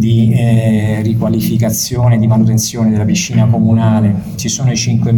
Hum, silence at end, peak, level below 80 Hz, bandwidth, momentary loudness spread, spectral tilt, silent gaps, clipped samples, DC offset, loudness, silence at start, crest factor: none; 0 s; 0 dBFS; -38 dBFS; 17.5 kHz; 4 LU; -6 dB/octave; none; under 0.1%; under 0.1%; -12 LUFS; 0 s; 10 dB